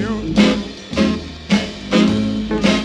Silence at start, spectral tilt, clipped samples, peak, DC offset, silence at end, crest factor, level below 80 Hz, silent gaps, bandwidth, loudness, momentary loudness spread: 0 s; -5.5 dB/octave; under 0.1%; 0 dBFS; under 0.1%; 0 s; 16 dB; -36 dBFS; none; 10.5 kHz; -18 LUFS; 7 LU